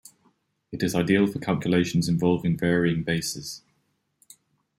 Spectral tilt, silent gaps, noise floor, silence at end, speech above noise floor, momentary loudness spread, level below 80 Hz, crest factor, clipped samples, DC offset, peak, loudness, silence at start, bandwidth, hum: -6 dB/octave; none; -72 dBFS; 1.2 s; 48 dB; 12 LU; -56 dBFS; 18 dB; under 0.1%; under 0.1%; -8 dBFS; -24 LUFS; 0.7 s; 15.5 kHz; none